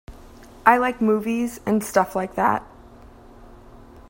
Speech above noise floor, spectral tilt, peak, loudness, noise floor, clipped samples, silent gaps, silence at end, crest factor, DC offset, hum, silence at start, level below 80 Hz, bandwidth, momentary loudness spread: 25 dB; -5.5 dB/octave; 0 dBFS; -21 LUFS; -45 dBFS; under 0.1%; none; 0.1 s; 24 dB; under 0.1%; none; 0.1 s; -50 dBFS; 16.5 kHz; 8 LU